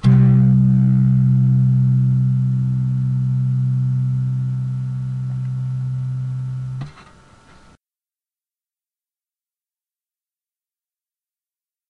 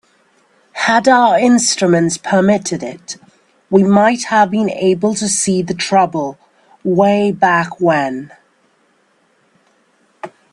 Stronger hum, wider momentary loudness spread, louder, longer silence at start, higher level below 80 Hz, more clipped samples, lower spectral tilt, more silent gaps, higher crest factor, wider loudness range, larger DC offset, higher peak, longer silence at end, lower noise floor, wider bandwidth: neither; second, 11 LU vs 17 LU; second, -18 LUFS vs -13 LUFS; second, 0.05 s vs 0.75 s; first, -46 dBFS vs -58 dBFS; neither; first, -10.5 dB/octave vs -4.5 dB/octave; neither; about the same, 16 dB vs 14 dB; first, 15 LU vs 3 LU; neither; second, -4 dBFS vs 0 dBFS; first, 5 s vs 0.25 s; first, under -90 dBFS vs -57 dBFS; second, 3.6 kHz vs 11.5 kHz